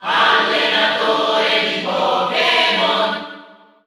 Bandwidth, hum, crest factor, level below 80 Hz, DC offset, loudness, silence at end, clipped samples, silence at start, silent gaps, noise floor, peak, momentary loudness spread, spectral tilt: 15 kHz; none; 14 dB; -64 dBFS; under 0.1%; -15 LUFS; 0.4 s; under 0.1%; 0 s; none; -43 dBFS; -2 dBFS; 5 LU; -3 dB/octave